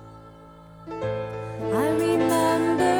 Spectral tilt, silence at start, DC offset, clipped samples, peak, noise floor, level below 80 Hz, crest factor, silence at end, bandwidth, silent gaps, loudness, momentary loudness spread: -5.5 dB/octave; 0 s; under 0.1%; under 0.1%; -10 dBFS; -46 dBFS; -54 dBFS; 16 dB; 0 s; 18 kHz; none; -24 LUFS; 12 LU